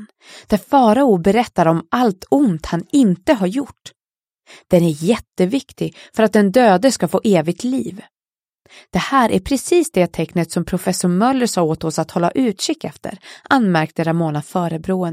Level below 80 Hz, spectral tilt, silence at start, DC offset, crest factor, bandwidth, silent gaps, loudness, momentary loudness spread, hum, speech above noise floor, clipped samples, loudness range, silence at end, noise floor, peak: -46 dBFS; -6 dB/octave; 0 s; under 0.1%; 16 dB; 16 kHz; none; -17 LUFS; 10 LU; none; over 73 dB; under 0.1%; 3 LU; 0 s; under -90 dBFS; 0 dBFS